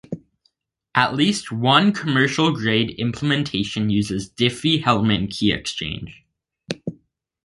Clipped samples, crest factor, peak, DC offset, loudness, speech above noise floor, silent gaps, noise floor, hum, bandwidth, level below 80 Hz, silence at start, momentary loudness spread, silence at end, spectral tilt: under 0.1%; 22 dB; 0 dBFS; under 0.1%; -20 LUFS; 47 dB; none; -68 dBFS; none; 11.5 kHz; -48 dBFS; 0.1 s; 14 LU; 0.5 s; -5 dB/octave